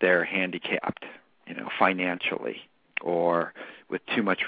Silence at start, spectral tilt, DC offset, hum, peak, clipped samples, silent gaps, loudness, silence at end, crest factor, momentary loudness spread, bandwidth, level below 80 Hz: 0 s; -8.5 dB/octave; under 0.1%; none; -6 dBFS; under 0.1%; none; -27 LUFS; 0 s; 22 dB; 17 LU; 5 kHz; -74 dBFS